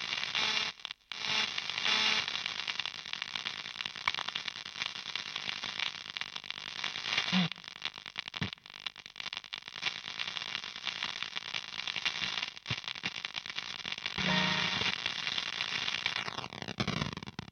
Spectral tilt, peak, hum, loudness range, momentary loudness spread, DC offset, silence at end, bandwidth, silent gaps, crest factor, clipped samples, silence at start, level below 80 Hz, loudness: -2.5 dB/octave; -10 dBFS; none; 5 LU; 10 LU; under 0.1%; 0.05 s; 12.5 kHz; none; 26 dB; under 0.1%; 0 s; -68 dBFS; -34 LUFS